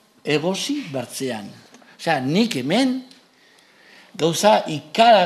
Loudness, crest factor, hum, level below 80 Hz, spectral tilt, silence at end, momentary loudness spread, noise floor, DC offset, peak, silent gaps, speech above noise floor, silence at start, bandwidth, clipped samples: -21 LUFS; 20 dB; none; -68 dBFS; -4.5 dB/octave; 0 s; 12 LU; -54 dBFS; under 0.1%; 0 dBFS; none; 35 dB; 0.25 s; 14.5 kHz; under 0.1%